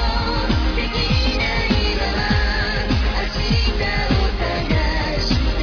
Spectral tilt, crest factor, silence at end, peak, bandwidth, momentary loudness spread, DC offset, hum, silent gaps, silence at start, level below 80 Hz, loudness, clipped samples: -5.5 dB/octave; 14 dB; 0 s; -4 dBFS; 5.4 kHz; 2 LU; under 0.1%; none; none; 0 s; -22 dBFS; -20 LUFS; under 0.1%